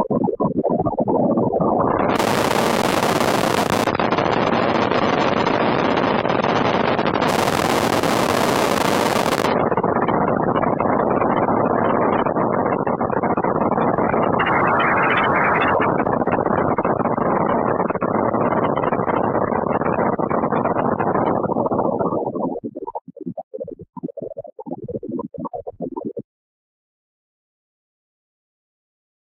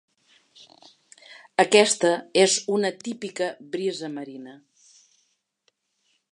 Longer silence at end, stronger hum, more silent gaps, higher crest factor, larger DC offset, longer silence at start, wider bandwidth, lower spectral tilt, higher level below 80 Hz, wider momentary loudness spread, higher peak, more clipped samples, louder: first, 3.1 s vs 1.75 s; neither; first, 23.01-23.05 s, 23.43-23.51 s vs none; second, 18 dB vs 24 dB; neither; second, 0 s vs 1.3 s; first, 16 kHz vs 11 kHz; first, -5.5 dB/octave vs -2.5 dB/octave; first, -48 dBFS vs -78 dBFS; second, 13 LU vs 18 LU; about the same, -2 dBFS vs -2 dBFS; neither; first, -19 LUFS vs -23 LUFS